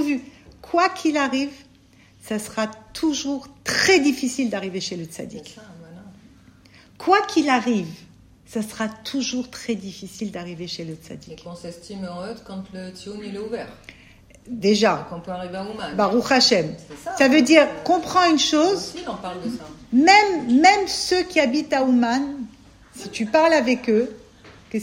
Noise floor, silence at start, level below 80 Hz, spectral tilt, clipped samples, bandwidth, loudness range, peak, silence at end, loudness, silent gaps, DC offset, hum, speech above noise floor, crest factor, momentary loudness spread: -53 dBFS; 0 s; -56 dBFS; -3.5 dB/octave; under 0.1%; 16 kHz; 14 LU; 0 dBFS; 0 s; -20 LUFS; none; under 0.1%; none; 32 dB; 22 dB; 19 LU